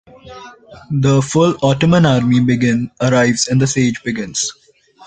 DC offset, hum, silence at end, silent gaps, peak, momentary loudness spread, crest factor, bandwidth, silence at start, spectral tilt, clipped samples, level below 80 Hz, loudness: under 0.1%; none; 0.55 s; none; -2 dBFS; 10 LU; 14 dB; 9.4 kHz; 0.25 s; -5.5 dB/octave; under 0.1%; -46 dBFS; -15 LUFS